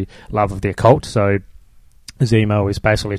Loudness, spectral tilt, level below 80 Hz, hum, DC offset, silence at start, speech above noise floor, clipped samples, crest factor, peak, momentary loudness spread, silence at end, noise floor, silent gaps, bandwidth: -17 LUFS; -7 dB/octave; -36 dBFS; none; under 0.1%; 0 s; 30 dB; under 0.1%; 18 dB; 0 dBFS; 8 LU; 0 s; -46 dBFS; none; 13 kHz